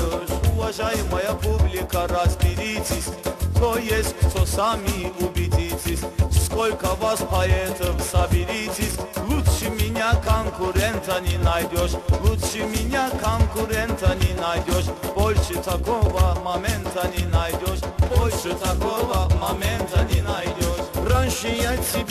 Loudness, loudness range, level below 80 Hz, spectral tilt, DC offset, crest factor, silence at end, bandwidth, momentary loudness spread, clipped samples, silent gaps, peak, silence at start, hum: -23 LUFS; 1 LU; -28 dBFS; -5 dB/octave; under 0.1%; 14 dB; 0 s; 14.5 kHz; 4 LU; under 0.1%; none; -8 dBFS; 0 s; none